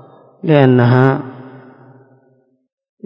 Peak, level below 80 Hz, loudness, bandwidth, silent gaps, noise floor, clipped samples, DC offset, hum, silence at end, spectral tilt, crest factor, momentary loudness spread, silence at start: 0 dBFS; -58 dBFS; -12 LUFS; 5.4 kHz; none; -56 dBFS; 0.2%; under 0.1%; none; 1.55 s; -10 dB/octave; 16 dB; 21 LU; 0.45 s